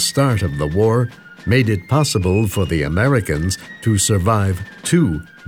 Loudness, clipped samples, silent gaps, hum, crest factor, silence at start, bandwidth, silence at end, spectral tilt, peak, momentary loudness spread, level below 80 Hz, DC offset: -17 LUFS; under 0.1%; none; none; 14 dB; 0 s; 19.5 kHz; 0 s; -5 dB/octave; -2 dBFS; 6 LU; -36 dBFS; under 0.1%